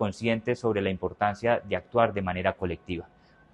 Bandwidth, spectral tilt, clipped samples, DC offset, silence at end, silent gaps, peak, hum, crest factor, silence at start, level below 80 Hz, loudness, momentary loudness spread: 10.5 kHz; -7 dB/octave; under 0.1%; under 0.1%; 0.45 s; none; -6 dBFS; none; 22 dB; 0 s; -54 dBFS; -28 LUFS; 9 LU